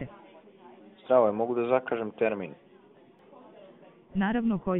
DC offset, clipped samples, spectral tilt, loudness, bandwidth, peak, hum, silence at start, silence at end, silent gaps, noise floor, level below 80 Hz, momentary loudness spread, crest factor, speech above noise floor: under 0.1%; under 0.1%; -6 dB/octave; -28 LUFS; 4 kHz; -8 dBFS; none; 0 s; 0 s; none; -57 dBFS; -60 dBFS; 16 LU; 20 dB; 30 dB